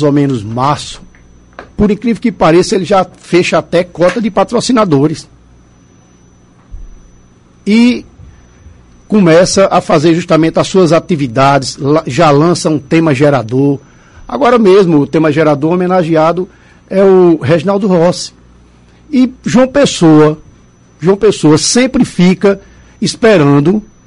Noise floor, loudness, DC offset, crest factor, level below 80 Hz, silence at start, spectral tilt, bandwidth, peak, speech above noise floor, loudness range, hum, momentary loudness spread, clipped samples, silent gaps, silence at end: -43 dBFS; -9 LUFS; under 0.1%; 10 dB; -38 dBFS; 0 s; -6 dB/octave; 11.5 kHz; 0 dBFS; 34 dB; 6 LU; 60 Hz at -40 dBFS; 8 LU; under 0.1%; none; 0.25 s